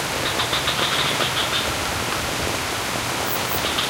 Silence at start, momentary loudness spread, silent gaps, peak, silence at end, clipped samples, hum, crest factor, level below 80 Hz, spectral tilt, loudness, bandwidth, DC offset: 0 s; 4 LU; none; -4 dBFS; 0 s; under 0.1%; none; 18 dB; -42 dBFS; -2 dB/octave; -21 LUFS; 17.5 kHz; under 0.1%